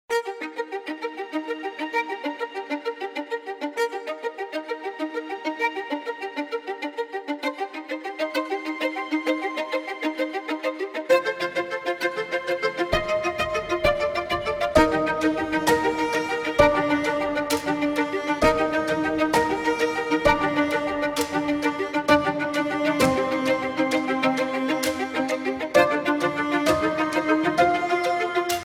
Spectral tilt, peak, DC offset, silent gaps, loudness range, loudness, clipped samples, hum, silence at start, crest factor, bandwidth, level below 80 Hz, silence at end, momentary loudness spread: -4.5 dB/octave; -2 dBFS; under 0.1%; none; 7 LU; -24 LUFS; under 0.1%; none; 0.1 s; 22 dB; 17 kHz; -48 dBFS; 0 s; 10 LU